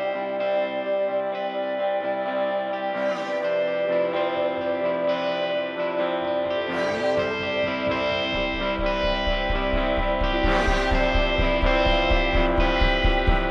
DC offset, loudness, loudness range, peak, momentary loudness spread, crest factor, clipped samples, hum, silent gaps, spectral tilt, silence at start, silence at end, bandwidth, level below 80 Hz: under 0.1%; -24 LUFS; 4 LU; -6 dBFS; 5 LU; 16 dB; under 0.1%; none; none; -6 dB/octave; 0 s; 0 s; 7.6 kHz; -30 dBFS